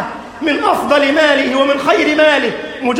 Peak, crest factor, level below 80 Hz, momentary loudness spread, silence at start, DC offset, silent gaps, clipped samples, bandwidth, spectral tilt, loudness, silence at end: 0 dBFS; 12 dB; -50 dBFS; 9 LU; 0 s; under 0.1%; none; under 0.1%; 16.5 kHz; -3.5 dB/octave; -13 LUFS; 0 s